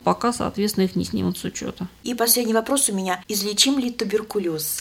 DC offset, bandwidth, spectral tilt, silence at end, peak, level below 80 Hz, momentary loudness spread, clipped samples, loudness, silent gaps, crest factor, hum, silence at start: under 0.1%; 17 kHz; -3.5 dB/octave; 0 s; -2 dBFS; -52 dBFS; 11 LU; under 0.1%; -22 LUFS; none; 20 dB; none; 0 s